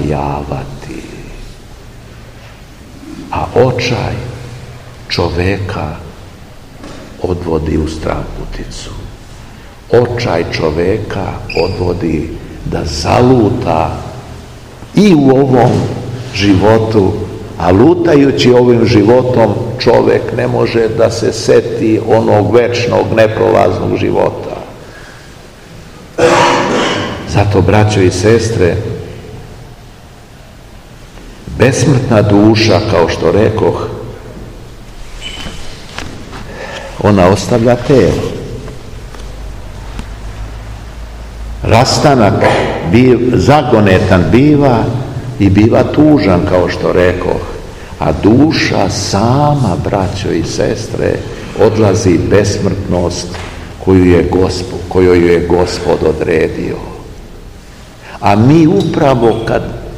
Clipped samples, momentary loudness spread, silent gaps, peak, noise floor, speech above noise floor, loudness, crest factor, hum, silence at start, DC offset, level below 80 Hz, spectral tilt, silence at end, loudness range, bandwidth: 2%; 21 LU; none; 0 dBFS; -34 dBFS; 25 dB; -10 LUFS; 12 dB; none; 0 s; 0.4%; -30 dBFS; -6.5 dB/octave; 0 s; 9 LU; 15 kHz